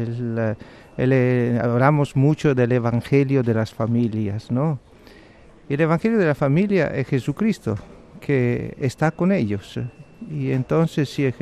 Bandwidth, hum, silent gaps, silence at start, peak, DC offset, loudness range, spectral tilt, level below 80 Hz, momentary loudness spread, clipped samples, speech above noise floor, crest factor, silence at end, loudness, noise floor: 12 kHz; none; none; 0 s; -4 dBFS; under 0.1%; 4 LU; -8 dB/octave; -50 dBFS; 10 LU; under 0.1%; 27 dB; 16 dB; 0 s; -21 LUFS; -47 dBFS